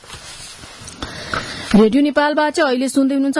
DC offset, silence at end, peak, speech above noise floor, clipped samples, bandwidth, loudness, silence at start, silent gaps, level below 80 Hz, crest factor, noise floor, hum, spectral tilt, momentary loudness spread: under 0.1%; 0 s; -4 dBFS; 21 dB; under 0.1%; 12 kHz; -16 LUFS; 0.1 s; none; -44 dBFS; 14 dB; -36 dBFS; none; -5 dB/octave; 20 LU